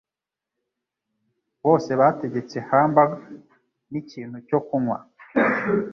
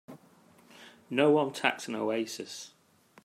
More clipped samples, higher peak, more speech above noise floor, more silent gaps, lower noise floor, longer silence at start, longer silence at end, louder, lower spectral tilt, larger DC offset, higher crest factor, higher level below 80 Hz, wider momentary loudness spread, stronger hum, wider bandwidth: neither; first, -2 dBFS vs -8 dBFS; first, 67 dB vs 31 dB; neither; first, -88 dBFS vs -60 dBFS; first, 1.65 s vs 0.1 s; second, 0 s vs 0.55 s; first, -22 LUFS vs -29 LUFS; first, -8 dB/octave vs -4.5 dB/octave; neither; about the same, 22 dB vs 24 dB; first, -66 dBFS vs -78 dBFS; about the same, 16 LU vs 17 LU; neither; second, 7.2 kHz vs 15.5 kHz